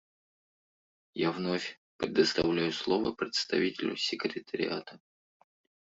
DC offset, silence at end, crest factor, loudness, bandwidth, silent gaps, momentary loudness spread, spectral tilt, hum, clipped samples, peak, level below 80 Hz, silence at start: under 0.1%; 0.9 s; 22 dB; -31 LUFS; 7.8 kHz; 1.77-1.99 s; 11 LU; -4.5 dB/octave; none; under 0.1%; -12 dBFS; -66 dBFS; 1.15 s